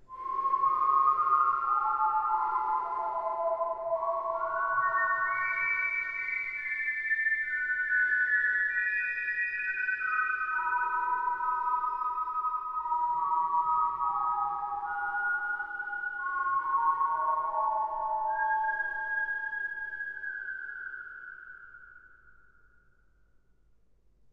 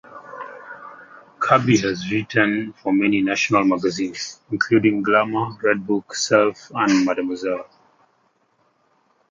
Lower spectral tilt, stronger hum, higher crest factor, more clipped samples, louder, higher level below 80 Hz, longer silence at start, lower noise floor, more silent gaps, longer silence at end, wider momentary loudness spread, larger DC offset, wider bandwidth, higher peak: about the same, -4.5 dB/octave vs -5 dB/octave; neither; about the same, 16 dB vs 20 dB; neither; second, -29 LUFS vs -20 LUFS; second, -66 dBFS vs -60 dBFS; about the same, 0 s vs 0.1 s; about the same, -63 dBFS vs -64 dBFS; neither; first, 2 s vs 1.65 s; second, 9 LU vs 18 LU; neither; second, 6.2 kHz vs 7.6 kHz; second, -14 dBFS vs -2 dBFS